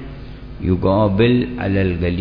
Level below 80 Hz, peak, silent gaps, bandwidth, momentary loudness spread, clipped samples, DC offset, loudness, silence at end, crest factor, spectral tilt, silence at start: -34 dBFS; -2 dBFS; none; 5.2 kHz; 20 LU; under 0.1%; under 0.1%; -17 LUFS; 0 s; 16 dB; -10.5 dB/octave; 0 s